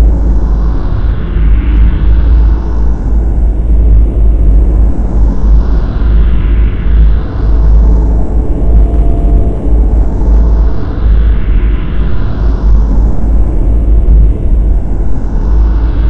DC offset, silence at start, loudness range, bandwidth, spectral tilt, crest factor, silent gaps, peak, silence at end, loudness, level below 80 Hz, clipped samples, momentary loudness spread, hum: under 0.1%; 0 s; 1 LU; 3.4 kHz; -10 dB/octave; 6 dB; none; 0 dBFS; 0 s; -11 LUFS; -8 dBFS; 2%; 5 LU; none